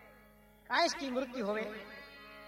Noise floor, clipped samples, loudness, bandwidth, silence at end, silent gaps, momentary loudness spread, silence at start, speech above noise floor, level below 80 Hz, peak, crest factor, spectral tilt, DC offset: -61 dBFS; under 0.1%; -35 LUFS; 16.5 kHz; 0 s; none; 18 LU; 0 s; 26 dB; -68 dBFS; -16 dBFS; 22 dB; -3 dB/octave; under 0.1%